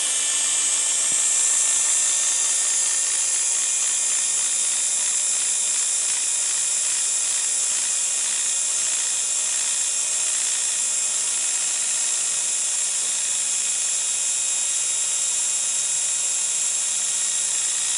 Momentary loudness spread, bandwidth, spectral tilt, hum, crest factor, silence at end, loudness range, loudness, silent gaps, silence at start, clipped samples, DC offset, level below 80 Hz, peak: 3 LU; 16 kHz; 3.5 dB/octave; none; 14 dB; 0 s; 2 LU; -19 LUFS; none; 0 s; under 0.1%; under 0.1%; -76 dBFS; -8 dBFS